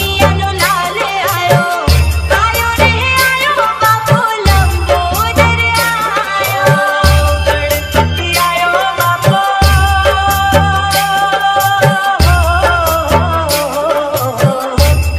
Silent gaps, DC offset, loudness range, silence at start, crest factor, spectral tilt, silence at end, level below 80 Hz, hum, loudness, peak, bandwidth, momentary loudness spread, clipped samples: none; under 0.1%; 1 LU; 0 s; 10 dB; -4 dB/octave; 0 s; -20 dBFS; none; -11 LUFS; 0 dBFS; 16.5 kHz; 4 LU; under 0.1%